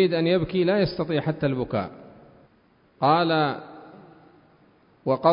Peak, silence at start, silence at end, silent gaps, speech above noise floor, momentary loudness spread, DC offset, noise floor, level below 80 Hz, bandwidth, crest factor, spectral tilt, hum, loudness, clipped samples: -6 dBFS; 0 s; 0 s; none; 38 dB; 15 LU; under 0.1%; -60 dBFS; -54 dBFS; 5.4 kHz; 20 dB; -11 dB/octave; none; -24 LUFS; under 0.1%